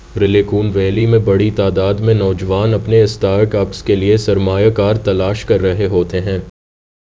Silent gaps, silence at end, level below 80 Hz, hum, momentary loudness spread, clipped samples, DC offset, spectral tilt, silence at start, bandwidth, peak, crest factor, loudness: none; 0.6 s; -32 dBFS; none; 4 LU; under 0.1%; under 0.1%; -7.5 dB/octave; 0.1 s; 7.8 kHz; 0 dBFS; 14 dB; -14 LUFS